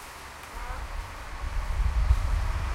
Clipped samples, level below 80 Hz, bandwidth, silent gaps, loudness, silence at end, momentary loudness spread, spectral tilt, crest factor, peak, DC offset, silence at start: under 0.1%; -30 dBFS; 15 kHz; none; -32 LUFS; 0 s; 13 LU; -5 dB/octave; 18 dB; -10 dBFS; under 0.1%; 0 s